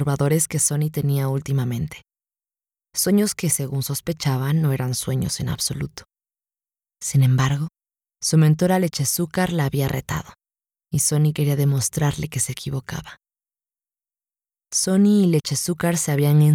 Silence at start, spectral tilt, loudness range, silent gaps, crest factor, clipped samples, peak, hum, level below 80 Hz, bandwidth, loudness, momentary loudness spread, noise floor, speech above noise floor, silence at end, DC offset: 0 s; -5 dB/octave; 4 LU; none; 16 dB; under 0.1%; -6 dBFS; none; -50 dBFS; 17 kHz; -21 LUFS; 11 LU; under -90 dBFS; over 70 dB; 0 s; under 0.1%